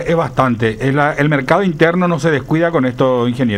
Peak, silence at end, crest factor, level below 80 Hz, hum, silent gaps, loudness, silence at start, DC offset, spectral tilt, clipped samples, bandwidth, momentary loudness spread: 0 dBFS; 0 s; 14 dB; -42 dBFS; none; none; -14 LUFS; 0 s; under 0.1%; -7 dB/octave; under 0.1%; 13 kHz; 2 LU